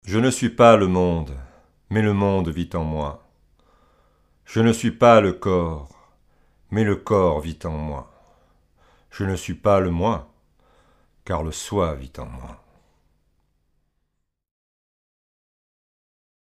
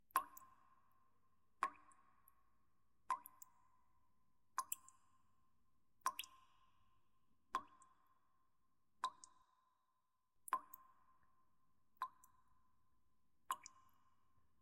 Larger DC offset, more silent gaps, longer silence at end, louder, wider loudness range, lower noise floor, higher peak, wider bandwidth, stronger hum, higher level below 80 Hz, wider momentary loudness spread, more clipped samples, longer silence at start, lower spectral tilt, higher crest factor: neither; neither; first, 4 s vs 1 s; first, -21 LUFS vs -49 LUFS; first, 11 LU vs 3 LU; second, -75 dBFS vs -89 dBFS; first, 0 dBFS vs -22 dBFS; about the same, 15 kHz vs 16 kHz; neither; first, -42 dBFS vs under -90 dBFS; about the same, 19 LU vs 18 LU; neither; about the same, 0.05 s vs 0.15 s; first, -6.5 dB/octave vs 0.5 dB/octave; second, 22 dB vs 32 dB